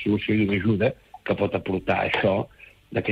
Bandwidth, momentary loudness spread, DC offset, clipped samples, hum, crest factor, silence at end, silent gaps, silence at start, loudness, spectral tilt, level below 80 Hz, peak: 7.6 kHz; 8 LU; under 0.1%; under 0.1%; none; 14 dB; 0 s; none; 0 s; -24 LUFS; -8.5 dB/octave; -52 dBFS; -10 dBFS